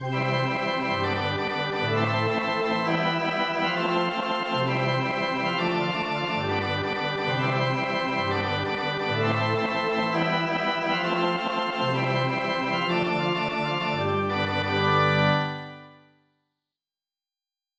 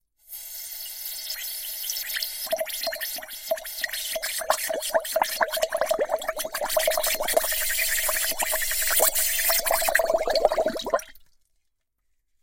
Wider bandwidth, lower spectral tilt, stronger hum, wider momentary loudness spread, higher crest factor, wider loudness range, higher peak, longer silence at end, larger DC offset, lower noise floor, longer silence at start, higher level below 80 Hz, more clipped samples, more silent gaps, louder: second, 8 kHz vs 16.5 kHz; first, -6 dB/octave vs 1 dB/octave; first, 50 Hz at -50 dBFS vs none; second, 3 LU vs 10 LU; second, 16 dB vs 22 dB; second, 1 LU vs 7 LU; second, -10 dBFS vs -4 dBFS; first, 1.85 s vs 1.2 s; neither; first, under -90 dBFS vs -73 dBFS; second, 0 s vs 0.3 s; second, -54 dBFS vs -48 dBFS; neither; neither; about the same, -25 LUFS vs -25 LUFS